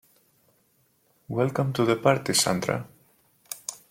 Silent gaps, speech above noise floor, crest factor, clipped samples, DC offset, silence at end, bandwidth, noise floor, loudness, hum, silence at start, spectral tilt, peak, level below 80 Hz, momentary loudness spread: none; 42 dB; 22 dB; under 0.1%; under 0.1%; 0.15 s; 16.5 kHz; -67 dBFS; -25 LUFS; none; 1.3 s; -4 dB/octave; -6 dBFS; -64 dBFS; 14 LU